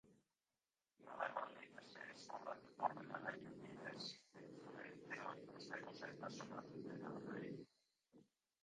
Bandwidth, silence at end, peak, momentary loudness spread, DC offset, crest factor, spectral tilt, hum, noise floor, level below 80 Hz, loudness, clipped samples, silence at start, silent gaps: 10 kHz; 0.4 s; -26 dBFS; 13 LU; under 0.1%; 28 dB; -4.5 dB/octave; none; under -90 dBFS; -90 dBFS; -52 LUFS; under 0.1%; 0.05 s; none